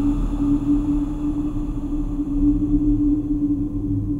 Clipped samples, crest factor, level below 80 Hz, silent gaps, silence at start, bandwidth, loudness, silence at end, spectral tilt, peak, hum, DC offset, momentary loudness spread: under 0.1%; 12 dB; -26 dBFS; none; 0 s; 7.2 kHz; -22 LUFS; 0 s; -10 dB/octave; -8 dBFS; none; under 0.1%; 7 LU